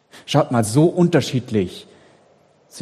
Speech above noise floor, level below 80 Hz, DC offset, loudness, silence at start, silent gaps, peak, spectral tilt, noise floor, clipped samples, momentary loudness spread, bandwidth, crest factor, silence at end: 38 dB; -56 dBFS; under 0.1%; -18 LUFS; 0.15 s; none; 0 dBFS; -6 dB/octave; -55 dBFS; under 0.1%; 9 LU; 13.5 kHz; 20 dB; 0 s